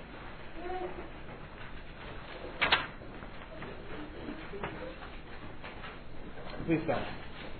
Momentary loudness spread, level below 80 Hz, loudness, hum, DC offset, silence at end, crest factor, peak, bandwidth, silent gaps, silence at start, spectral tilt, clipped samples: 16 LU; -48 dBFS; -38 LUFS; none; under 0.1%; 0 s; 30 dB; -8 dBFS; 4.6 kHz; none; 0 s; -2.5 dB/octave; under 0.1%